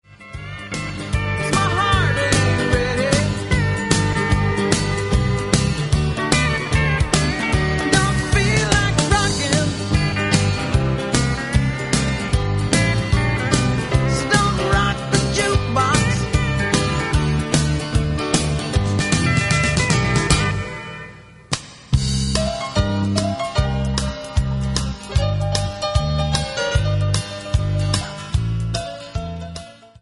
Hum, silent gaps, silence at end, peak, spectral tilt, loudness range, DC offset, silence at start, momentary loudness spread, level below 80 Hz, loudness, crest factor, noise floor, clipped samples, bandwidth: none; none; 0.3 s; 0 dBFS; -4.5 dB/octave; 4 LU; under 0.1%; 0.1 s; 7 LU; -28 dBFS; -19 LUFS; 18 dB; -39 dBFS; under 0.1%; 11.5 kHz